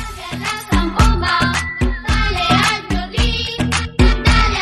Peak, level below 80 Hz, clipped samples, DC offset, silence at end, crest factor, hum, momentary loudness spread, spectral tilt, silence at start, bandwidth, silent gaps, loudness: 0 dBFS; -20 dBFS; under 0.1%; under 0.1%; 0 s; 16 dB; none; 7 LU; -4.5 dB/octave; 0 s; 13.5 kHz; none; -16 LUFS